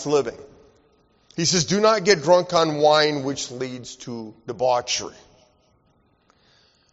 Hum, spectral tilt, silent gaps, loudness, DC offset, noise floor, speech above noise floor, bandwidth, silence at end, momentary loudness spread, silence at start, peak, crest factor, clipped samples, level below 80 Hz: none; -3 dB/octave; none; -20 LUFS; under 0.1%; -63 dBFS; 42 dB; 8 kHz; 1.8 s; 18 LU; 0 s; -2 dBFS; 20 dB; under 0.1%; -60 dBFS